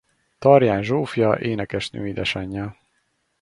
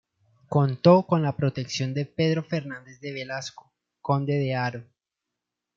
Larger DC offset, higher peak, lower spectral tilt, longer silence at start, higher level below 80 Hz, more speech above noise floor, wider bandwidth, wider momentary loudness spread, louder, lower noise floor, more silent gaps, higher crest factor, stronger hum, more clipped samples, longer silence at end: neither; first, 0 dBFS vs -6 dBFS; about the same, -6.5 dB/octave vs -7 dB/octave; about the same, 0.4 s vs 0.5 s; first, -50 dBFS vs -66 dBFS; second, 49 dB vs 61 dB; first, 11.5 kHz vs 7.6 kHz; second, 13 LU vs 18 LU; first, -21 LUFS vs -25 LUFS; second, -69 dBFS vs -86 dBFS; neither; about the same, 22 dB vs 20 dB; neither; neither; second, 0.7 s vs 0.95 s